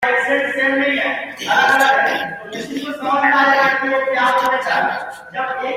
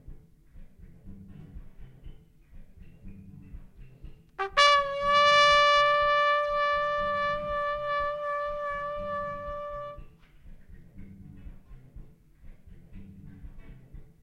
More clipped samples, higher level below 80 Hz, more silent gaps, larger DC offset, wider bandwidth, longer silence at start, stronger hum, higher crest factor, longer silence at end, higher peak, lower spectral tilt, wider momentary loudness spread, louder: neither; second, -62 dBFS vs -48 dBFS; neither; neither; first, 16 kHz vs 11 kHz; about the same, 0 s vs 0.05 s; neither; second, 14 dB vs 24 dB; second, 0 s vs 0.2 s; first, -2 dBFS vs -6 dBFS; about the same, -3 dB/octave vs -2 dB/octave; second, 13 LU vs 26 LU; first, -16 LUFS vs -25 LUFS